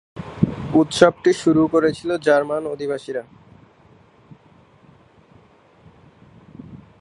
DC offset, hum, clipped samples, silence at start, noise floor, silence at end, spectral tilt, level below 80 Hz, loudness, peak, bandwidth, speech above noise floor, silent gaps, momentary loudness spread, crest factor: under 0.1%; none; under 0.1%; 0.15 s; -52 dBFS; 0.25 s; -6 dB/octave; -52 dBFS; -19 LUFS; 0 dBFS; 11.5 kHz; 34 dB; none; 16 LU; 22 dB